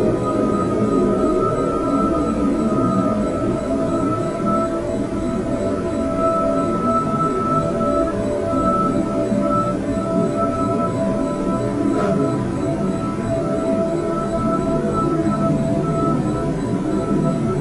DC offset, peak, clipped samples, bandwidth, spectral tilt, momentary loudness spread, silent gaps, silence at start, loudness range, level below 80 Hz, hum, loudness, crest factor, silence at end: 0.2%; -6 dBFS; under 0.1%; 12 kHz; -8 dB/octave; 4 LU; none; 0 s; 2 LU; -36 dBFS; none; -20 LUFS; 14 dB; 0 s